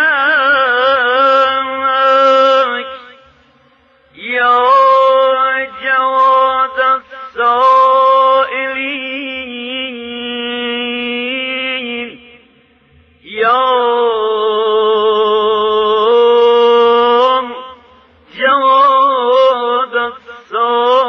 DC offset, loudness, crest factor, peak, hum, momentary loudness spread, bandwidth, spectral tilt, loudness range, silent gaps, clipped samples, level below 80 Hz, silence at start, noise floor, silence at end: under 0.1%; -12 LUFS; 12 dB; 0 dBFS; none; 13 LU; 7 kHz; -3.5 dB/octave; 8 LU; none; under 0.1%; -58 dBFS; 0 s; -50 dBFS; 0 s